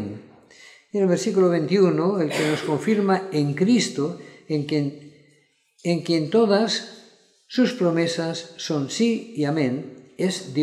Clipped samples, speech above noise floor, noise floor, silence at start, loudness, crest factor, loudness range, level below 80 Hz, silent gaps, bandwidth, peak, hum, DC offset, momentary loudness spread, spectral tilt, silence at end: under 0.1%; 40 dB; -62 dBFS; 0 s; -22 LUFS; 16 dB; 3 LU; -74 dBFS; none; 13.5 kHz; -6 dBFS; none; under 0.1%; 11 LU; -5.5 dB/octave; 0 s